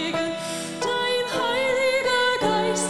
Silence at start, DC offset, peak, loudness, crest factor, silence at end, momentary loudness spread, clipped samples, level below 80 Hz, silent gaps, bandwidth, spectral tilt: 0 s; under 0.1%; -8 dBFS; -23 LUFS; 14 dB; 0 s; 7 LU; under 0.1%; -60 dBFS; none; 14.5 kHz; -2.5 dB/octave